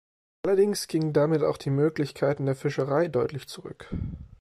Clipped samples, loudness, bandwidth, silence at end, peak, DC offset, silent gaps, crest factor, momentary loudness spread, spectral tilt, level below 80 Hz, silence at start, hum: under 0.1%; -26 LUFS; 13 kHz; 0.15 s; -12 dBFS; under 0.1%; none; 14 dB; 14 LU; -6.5 dB/octave; -50 dBFS; 0.45 s; none